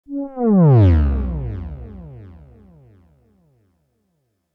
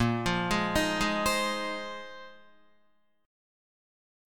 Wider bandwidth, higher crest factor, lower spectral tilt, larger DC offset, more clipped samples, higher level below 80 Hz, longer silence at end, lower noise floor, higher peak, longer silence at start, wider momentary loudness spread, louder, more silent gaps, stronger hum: second, 4.6 kHz vs 17.5 kHz; about the same, 14 dB vs 18 dB; first, -12 dB/octave vs -4 dB/octave; second, under 0.1% vs 0.3%; neither; first, -28 dBFS vs -50 dBFS; first, 2.25 s vs 1 s; about the same, -69 dBFS vs -71 dBFS; first, -4 dBFS vs -14 dBFS; about the same, 0.1 s vs 0 s; first, 25 LU vs 15 LU; first, -16 LUFS vs -29 LUFS; neither; neither